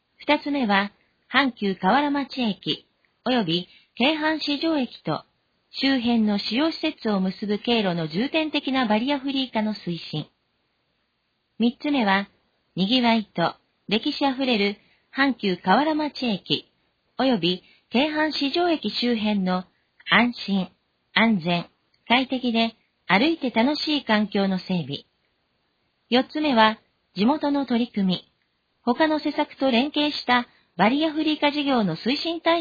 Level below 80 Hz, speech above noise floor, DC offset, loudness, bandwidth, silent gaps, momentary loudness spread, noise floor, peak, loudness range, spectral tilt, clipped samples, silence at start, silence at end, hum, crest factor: -62 dBFS; 50 dB; under 0.1%; -23 LUFS; 5 kHz; none; 9 LU; -73 dBFS; -2 dBFS; 2 LU; -6.5 dB/octave; under 0.1%; 0.2 s; 0 s; none; 22 dB